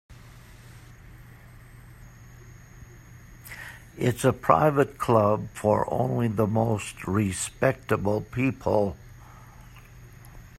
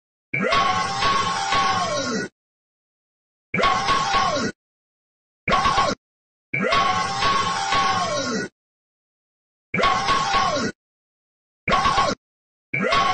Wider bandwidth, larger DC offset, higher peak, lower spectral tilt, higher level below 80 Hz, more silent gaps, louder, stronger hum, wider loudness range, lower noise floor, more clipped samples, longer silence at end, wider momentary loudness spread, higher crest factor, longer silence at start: first, 15.5 kHz vs 9 kHz; neither; first, -2 dBFS vs -8 dBFS; first, -6.5 dB/octave vs -3 dB/octave; second, -52 dBFS vs -44 dBFS; second, none vs 2.32-3.53 s, 4.55-5.47 s, 5.98-6.53 s, 8.52-9.73 s, 10.75-11.67 s, 12.17-12.73 s; second, -25 LUFS vs -21 LUFS; neither; first, 9 LU vs 3 LU; second, -48 dBFS vs under -90 dBFS; neither; about the same, 0 s vs 0 s; first, 19 LU vs 9 LU; first, 24 dB vs 16 dB; second, 0.1 s vs 0.35 s